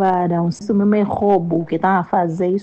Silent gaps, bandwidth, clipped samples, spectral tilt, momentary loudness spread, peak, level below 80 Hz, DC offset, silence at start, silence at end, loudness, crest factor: none; 8.4 kHz; under 0.1%; -8.5 dB/octave; 3 LU; -4 dBFS; -54 dBFS; under 0.1%; 0 s; 0 s; -17 LUFS; 12 dB